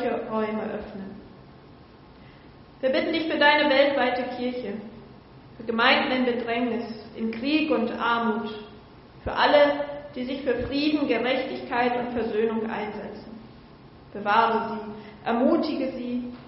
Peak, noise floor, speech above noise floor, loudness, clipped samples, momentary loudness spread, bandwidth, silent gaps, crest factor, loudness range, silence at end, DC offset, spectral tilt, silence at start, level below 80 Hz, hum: -6 dBFS; -49 dBFS; 24 dB; -25 LUFS; under 0.1%; 18 LU; 5.8 kHz; none; 20 dB; 4 LU; 0 s; under 0.1%; -2 dB/octave; 0 s; -54 dBFS; none